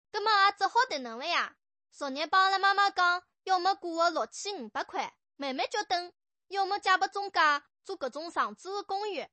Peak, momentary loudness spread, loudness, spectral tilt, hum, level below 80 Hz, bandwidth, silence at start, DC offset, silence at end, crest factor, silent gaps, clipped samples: -12 dBFS; 13 LU; -29 LUFS; -0.5 dB/octave; none; -82 dBFS; 8.4 kHz; 0.15 s; under 0.1%; 0.05 s; 18 dB; none; under 0.1%